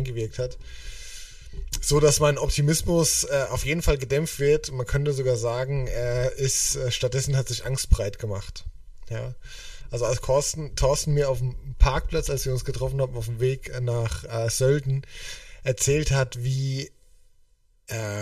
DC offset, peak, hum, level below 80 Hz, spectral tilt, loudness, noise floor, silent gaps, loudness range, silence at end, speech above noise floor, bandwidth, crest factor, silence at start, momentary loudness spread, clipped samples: under 0.1%; -4 dBFS; none; -32 dBFS; -4.5 dB/octave; -25 LUFS; -59 dBFS; none; 5 LU; 0 s; 35 dB; 15.5 kHz; 22 dB; 0 s; 16 LU; under 0.1%